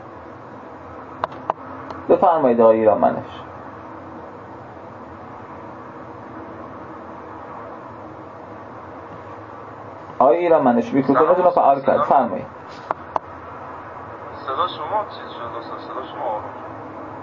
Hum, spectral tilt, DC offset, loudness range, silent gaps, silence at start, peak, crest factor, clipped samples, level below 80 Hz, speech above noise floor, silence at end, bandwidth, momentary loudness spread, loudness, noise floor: none; -8 dB/octave; under 0.1%; 19 LU; none; 0 s; -2 dBFS; 20 dB; under 0.1%; -56 dBFS; 20 dB; 0 s; 7 kHz; 22 LU; -19 LUFS; -37 dBFS